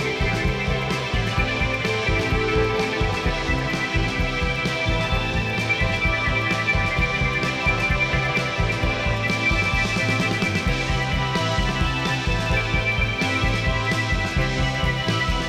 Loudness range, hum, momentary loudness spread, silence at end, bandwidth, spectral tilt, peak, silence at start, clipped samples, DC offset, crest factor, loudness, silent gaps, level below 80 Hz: 1 LU; none; 3 LU; 0 s; 15 kHz; -5 dB/octave; -10 dBFS; 0 s; under 0.1%; under 0.1%; 12 dB; -22 LUFS; none; -30 dBFS